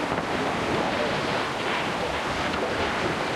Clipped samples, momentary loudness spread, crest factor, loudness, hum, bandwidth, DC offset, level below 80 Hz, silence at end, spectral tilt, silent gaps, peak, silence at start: under 0.1%; 1 LU; 14 dB; -26 LUFS; none; 15.5 kHz; under 0.1%; -48 dBFS; 0 s; -4.5 dB/octave; none; -12 dBFS; 0 s